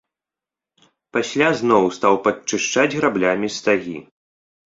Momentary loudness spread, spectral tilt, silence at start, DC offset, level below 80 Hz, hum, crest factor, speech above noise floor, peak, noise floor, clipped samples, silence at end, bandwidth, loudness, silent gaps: 8 LU; -4 dB/octave; 1.15 s; under 0.1%; -60 dBFS; none; 20 dB; 70 dB; -2 dBFS; -88 dBFS; under 0.1%; 0.65 s; 7.8 kHz; -19 LUFS; none